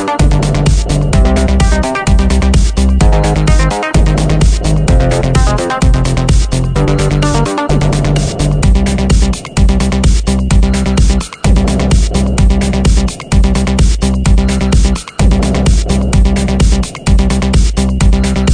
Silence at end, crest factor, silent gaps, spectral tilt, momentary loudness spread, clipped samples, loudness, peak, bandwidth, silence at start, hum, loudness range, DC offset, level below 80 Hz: 0 s; 10 dB; none; -6 dB/octave; 2 LU; under 0.1%; -11 LUFS; 0 dBFS; 10 kHz; 0 s; none; 1 LU; under 0.1%; -12 dBFS